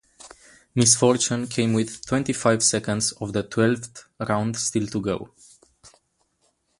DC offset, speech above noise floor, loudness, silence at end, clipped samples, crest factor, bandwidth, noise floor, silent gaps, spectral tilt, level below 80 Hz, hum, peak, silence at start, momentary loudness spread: under 0.1%; 46 dB; -22 LUFS; 0.9 s; under 0.1%; 22 dB; 11.5 kHz; -69 dBFS; none; -4 dB/octave; -56 dBFS; none; -2 dBFS; 0.25 s; 12 LU